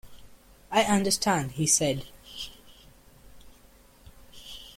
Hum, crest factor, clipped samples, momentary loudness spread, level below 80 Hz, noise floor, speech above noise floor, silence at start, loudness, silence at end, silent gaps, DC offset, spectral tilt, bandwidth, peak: none; 22 dB; under 0.1%; 21 LU; -54 dBFS; -56 dBFS; 31 dB; 0.05 s; -25 LUFS; 0.05 s; none; under 0.1%; -3 dB/octave; 16.5 kHz; -8 dBFS